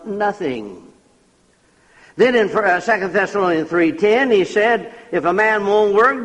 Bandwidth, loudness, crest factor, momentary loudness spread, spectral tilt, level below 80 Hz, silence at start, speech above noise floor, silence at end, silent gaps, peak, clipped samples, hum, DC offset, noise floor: 9.6 kHz; -16 LUFS; 14 dB; 10 LU; -5.5 dB/octave; -58 dBFS; 0 s; 40 dB; 0 s; none; -2 dBFS; under 0.1%; none; under 0.1%; -56 dBFS